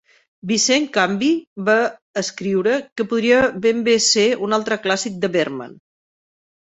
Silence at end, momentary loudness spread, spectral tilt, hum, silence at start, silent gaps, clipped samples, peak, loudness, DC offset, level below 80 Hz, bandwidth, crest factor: 1 s; 9 LU; -3 dB/octave; none; 0.45 s; 1.47-1.56 s, 2.02-2.14 s, 2.92-2.96 s; under 0.1%; -2 dBFS; -18 LUFS; under 0.1%; -58 dBFS; 8.4 kHz; 18 dB